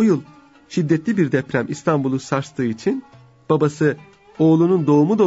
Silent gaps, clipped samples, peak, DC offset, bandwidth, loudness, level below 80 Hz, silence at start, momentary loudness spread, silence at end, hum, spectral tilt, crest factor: none; under 0.1%; -4 dBFS; under 0.1%; 8 kHz; -19 LUFS; -60 dBFS; 0 s; 9 LU; 0 s; none; -7.5 dB/octave; 14 dB